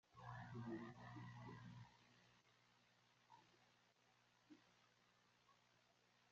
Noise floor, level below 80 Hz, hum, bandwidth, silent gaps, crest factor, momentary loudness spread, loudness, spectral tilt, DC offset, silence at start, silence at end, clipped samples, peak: -79 dBFS; -84 dBFS; 60 Hz at -75 dBFS; 7.4 kHz; none; 20 dB; 9 LU; -57 LUFS; -6 dB/octave; under 0.1%; 0.1 s; 0 s; under 0.1%; -42 dBFS